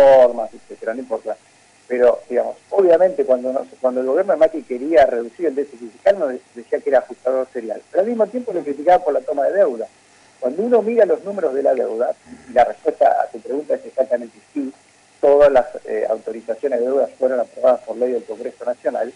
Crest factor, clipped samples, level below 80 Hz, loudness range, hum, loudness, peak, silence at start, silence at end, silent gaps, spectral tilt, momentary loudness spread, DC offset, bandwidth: 14 dB; under 0.1%; -56 dBFS; 3 LU; none; -18 LUFS; -4 dBFS; 0 s; 0.05 s; none; -6 dB/octave; 13 LU; under 0.1%; 11 kHz